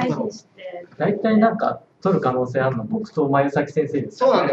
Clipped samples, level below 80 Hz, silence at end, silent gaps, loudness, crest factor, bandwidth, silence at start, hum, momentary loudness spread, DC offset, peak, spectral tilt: under 0.1%; -62 dBFS; 0 s; none; -21 LUFS; 18 dB; 7.8 kHz; 0 s; none; 12 LU; under 0.1%; -4 dBFS; -7.5 dB/octave